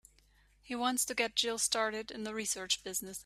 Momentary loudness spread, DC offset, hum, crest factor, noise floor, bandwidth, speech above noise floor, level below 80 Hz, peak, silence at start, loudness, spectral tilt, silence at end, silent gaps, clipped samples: 9 LU; under 0.1%; 50 Hz at -70 dBFS; 22 dB; -67 dBFS; 15.5 kHz; 31 dB; -68 dBFS; -14 dBFS; 0.65 s; -33 LUFS; -0.5 dB/octave; 0.05 s; none; under 0.1%